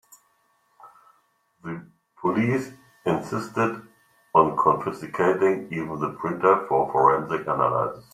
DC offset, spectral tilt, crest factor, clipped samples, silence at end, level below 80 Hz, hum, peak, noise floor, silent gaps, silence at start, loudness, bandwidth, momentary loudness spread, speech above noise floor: under 0.1%; -7.5 dB/octave; 22 dB; under 0.1%; 0.1 s; -62 dBFS; none; -2 dBFS; -66 dBFS; none; 0.85 s; -23 LUFS; 14 kHz; 16 LU; 44 dB